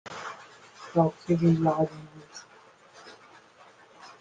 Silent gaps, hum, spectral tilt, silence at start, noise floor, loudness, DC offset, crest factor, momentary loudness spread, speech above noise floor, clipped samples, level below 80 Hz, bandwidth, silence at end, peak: none; none; -8 dB/octave; 0.05 s; -55 dBFS; -26 LUFS; under 0.1%; 20 dB; 26 LU; 30 dB; under 0.1%; -64 dBFS; 7.6 kHz; 0.15 s; -10 dBFS